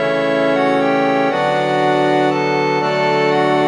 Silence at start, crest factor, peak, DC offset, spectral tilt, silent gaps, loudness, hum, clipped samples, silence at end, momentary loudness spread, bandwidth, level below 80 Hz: 0 s; 12 dB; -2 dBFS; under 0.1%; -6 dB/octave; none; -15 LUFS; none; under 0.1%; 0 s; 2 LU; 11 kHz; -62 dBFS